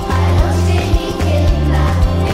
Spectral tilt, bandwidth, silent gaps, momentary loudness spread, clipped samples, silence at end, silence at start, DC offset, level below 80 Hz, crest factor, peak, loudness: -6.5 dB/octave; 14 kHz; none; 3 LU; under 0.1%; 0 s; 0 s; under 0.1%; -18 dBFS; 12 dB; 0 dBFS; -15 LUFS